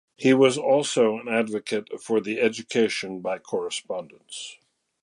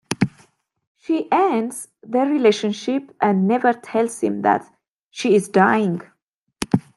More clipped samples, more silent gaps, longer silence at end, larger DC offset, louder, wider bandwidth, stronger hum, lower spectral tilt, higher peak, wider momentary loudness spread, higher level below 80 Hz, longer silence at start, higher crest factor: neither; second, none vs 0.87-0.95 s, 4.90-5.10 s, 6.23-6.27 s, 6.33-6.47 s; first, 0.5 s vs 0.15 s; neither; second, -24 LUFS vs -20 LUFS; about the same, 11.5 kHz vs 12.5 kHz; neither; second, -4 dB/octave vs -6 dB/octave; second, -6 dBFS vs 0 dBFS; first, 17 LU vs 10 LU; second, -74 dBFS vs -60 dBFS; about the same, 0.2 s vs 0.1 s; about the same, 18 dB vs 20 dB